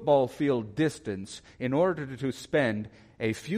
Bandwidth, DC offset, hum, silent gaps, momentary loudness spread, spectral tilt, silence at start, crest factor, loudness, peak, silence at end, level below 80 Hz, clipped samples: 15 kHz; under 0.1%; none; none; 11 LU; -6.5 dB/octave; 0 s; 18 dB; -29 LUFS; -10 dBFS; 0 s; -62 dBFS; under 0.1%